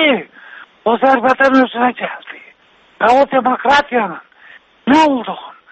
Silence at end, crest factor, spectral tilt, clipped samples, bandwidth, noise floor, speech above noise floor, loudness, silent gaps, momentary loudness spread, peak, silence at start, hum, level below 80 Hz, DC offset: 0.2 s; 14 dB; -4.5 dB/octave; under 0.1%; 8.4 kHz; -50 dBFS; 37 dB; -14 LUFS; none; 17 LU; 0 dBFS; 0 s; none; -52 dBFS; under 0.1%